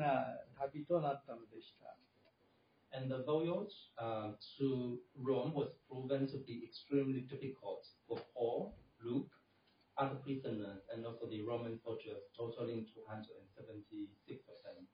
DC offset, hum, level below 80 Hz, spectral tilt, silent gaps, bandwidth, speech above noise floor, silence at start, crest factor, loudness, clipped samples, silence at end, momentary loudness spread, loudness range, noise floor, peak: under 0.1%; none; -78 dBFS; -6.5 dB/octave; none; 5 kHz; 31 dB; 0 s; 20 dB; -43 LUFS; under 0.1%; 0.05 s; 16 LU; 6 LU; -74 dBFS; -24 dBFS